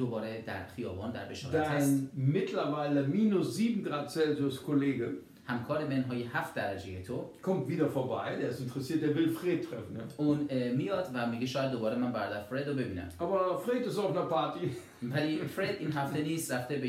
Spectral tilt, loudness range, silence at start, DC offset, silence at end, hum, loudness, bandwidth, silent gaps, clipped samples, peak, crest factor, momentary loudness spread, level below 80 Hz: -6.5 dB/octave; 3 LU; 0 s; under 0.1%; 0 s; none; -33 LUFS; 16 kHz; none; under 0.1%; -16 dBFS; 16 dB; 9 LU; -72 dBFS